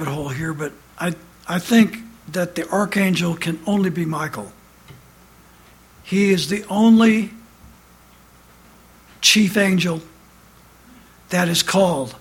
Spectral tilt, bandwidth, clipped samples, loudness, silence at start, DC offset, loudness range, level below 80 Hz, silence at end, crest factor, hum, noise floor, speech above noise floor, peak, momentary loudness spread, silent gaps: -4.5 dB/octave; 17 kHz; under 0.1%; -19 LUFS; 0 s; under 0.1%; 5 LU; -54 dBFS; 0.05 s; 20 dB; 60 Hz at -45 dBFS; -49 dBFS; 31 dB; -2 dBFS; 15 LU; none